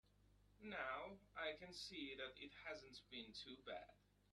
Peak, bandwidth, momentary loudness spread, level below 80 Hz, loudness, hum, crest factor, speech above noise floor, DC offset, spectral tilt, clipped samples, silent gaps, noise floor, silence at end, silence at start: -34 dBFS; 12.5 kHz; 7 LU; -76 dBFS; -53 LUFS; 50 Hz at -75 dBFS; 20 dB; 20 dB; under 0.1%; -3 dB/octave; under 0.1%; none; -74 dBFS; 0.35 s; 0.2 s